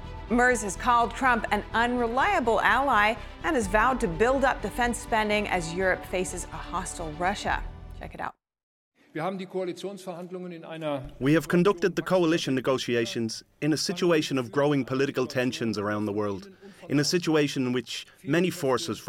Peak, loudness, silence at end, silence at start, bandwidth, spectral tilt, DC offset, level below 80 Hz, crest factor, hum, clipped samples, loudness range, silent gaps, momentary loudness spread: -6 dBFS; -26 LUFS; 0 s; 0 s; 17 kHz; -4.5 dB/octave; under 0.1%; -44 dBFS; 20 dB; none; under 0.1%; 9 LU; 8.63-8.92 s; 13 LU